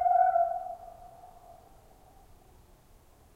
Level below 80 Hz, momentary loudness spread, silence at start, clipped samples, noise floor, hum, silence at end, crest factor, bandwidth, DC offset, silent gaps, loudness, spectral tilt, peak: -60 dBFS; 28 LU; 0 s; under 0.1%; -59 dBFS; none; 1.85 s; 18 dB; 7.6 kHz; under 0.1%; none; -28 LUFS; -5 dB/octave; -14 dBFS